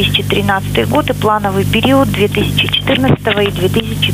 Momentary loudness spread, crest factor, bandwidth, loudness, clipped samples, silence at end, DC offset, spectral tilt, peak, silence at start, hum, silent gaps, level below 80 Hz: 3 LU; 12 dB; 16 kHz; -13 LUFS; under 0.1%; 0 s; under 0.1%; -5.5 dB/octave; 0 dBFS; 0 s; 50 Hz at -20 dBFS; none; -32 dBFS